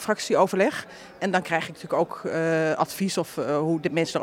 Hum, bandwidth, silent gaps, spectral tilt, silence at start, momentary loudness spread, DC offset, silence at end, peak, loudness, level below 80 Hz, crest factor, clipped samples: none; 17 kHz; none; -5 dB/octave; 0 s; 6 LU; under 0.1%; 0 s; -6 dBFS; -25 LUFS; -68 dBFS; 18 dB; under 0.1%